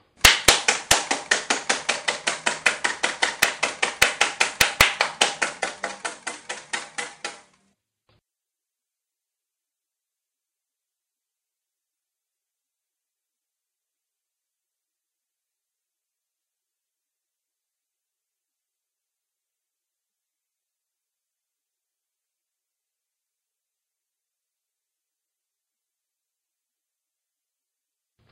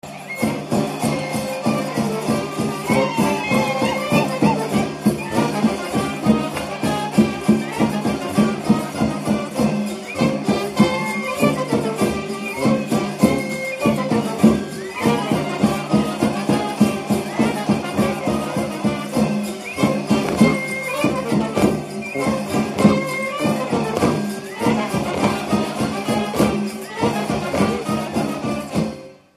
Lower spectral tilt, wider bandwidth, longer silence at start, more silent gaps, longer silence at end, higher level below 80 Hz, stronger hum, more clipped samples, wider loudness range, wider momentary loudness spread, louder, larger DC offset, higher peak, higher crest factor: second, 0 dB/octave vs -5.5 dB/octave; about the same, 15 kHz vs 15 kHz; first, 0.25 s vs 0.05 s; neither; first, 20.95 s vs 0.2 s; second, -52 dBFS vs -46 dBFS; neither; neither; first, 16 LU vs 2 LU; first, 15 LU vs 6 LU; about the same, -21 LUFS vs -20 LUFS; neither; about the same, 0 dBFS vs 0 dBFS; first, 30 dB vs 20 dB